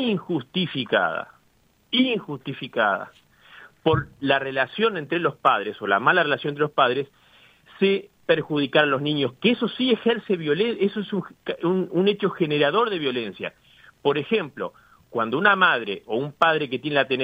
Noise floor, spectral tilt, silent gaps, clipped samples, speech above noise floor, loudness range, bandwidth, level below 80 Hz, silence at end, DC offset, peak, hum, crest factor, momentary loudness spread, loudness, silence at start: -62 dBFS; -7.5 dB/octave; none; under 0.1%; 39 dB; 3 LU; 16 kHz; -62 dBFS; 0 s; under 0.1%; -2 dBFS; none; 20 dB; 10 LU; -23 LUFS; 0 s